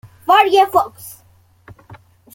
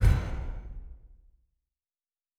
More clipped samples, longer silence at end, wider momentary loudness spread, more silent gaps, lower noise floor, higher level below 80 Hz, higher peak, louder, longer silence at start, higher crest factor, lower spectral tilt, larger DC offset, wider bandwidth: neither; about the same, 1.25 s vs 1.3 s; about the same, 24 LU vs 24 LU; neither; second, -49 dBFS vs under -90 dBFS; second, -58 dBFS vs -34 dBFS; first, 0 dBFS vs -12 dBFS; first, -14 LUFS vs -33 LUFS; first, 0.3 s vs 0 s; about the same, 18 dB vs 20 dB; second, -3.5 dB/octave vs -7 dB/octave; neither; first, 17 kHz vs 12.5 kHz